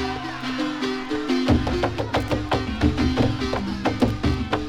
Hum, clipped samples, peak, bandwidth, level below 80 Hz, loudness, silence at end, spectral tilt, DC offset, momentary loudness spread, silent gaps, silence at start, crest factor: none; under 0.1%; -6 dBFS; 15 kHz; -34 dBFS; -24 LUFS; 0 s; -6.5 dB/octave; under 0.1%; 6 LU; none; 0 s; 18 dB